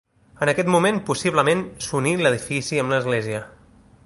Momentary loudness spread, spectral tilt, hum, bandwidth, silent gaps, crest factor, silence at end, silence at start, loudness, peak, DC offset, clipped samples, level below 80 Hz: 6 LU; -5 dB/octave; none; 11.5 kHz; none; 20 dB; 0.55 s; 0.4 s; -21 LUFS; -2 dBFS; under 0.1%; under 0.1%; -56 dBFS